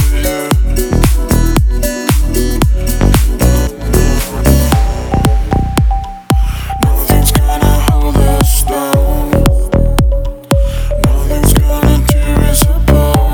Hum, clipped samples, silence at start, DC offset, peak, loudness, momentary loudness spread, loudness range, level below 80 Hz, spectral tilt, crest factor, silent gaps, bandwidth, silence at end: none; under 0.1%; 0 s; under 0.1%; 0 dBFS; -12 LUFS; 4 LU; 1 LU; -12 dBFS; -5.5 dB/octave; 10 dB; none; over 20 kHz; 0 s